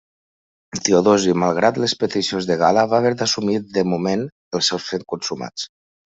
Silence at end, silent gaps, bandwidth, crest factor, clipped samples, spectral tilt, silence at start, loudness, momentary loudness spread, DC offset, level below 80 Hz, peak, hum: 0.4 s; 4.32-4.51 s; 8.2 kHz; 18 dB; under 0.1%; -4 dB/octave; 0.75 s; -19 LUFS; 11 LU; under 0.1%; -60 dBFS; -2 dBFS; none